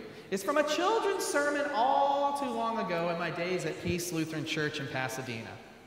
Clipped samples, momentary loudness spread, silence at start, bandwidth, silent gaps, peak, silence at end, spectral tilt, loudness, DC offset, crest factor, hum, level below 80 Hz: under 0.1%; 8 LU; 0 s; 16 kHz; none; -14 dBFS; 0 s; -4 dB/octave; -31 LUFS; under 0.1%; 18 dB; none; -64 dBFS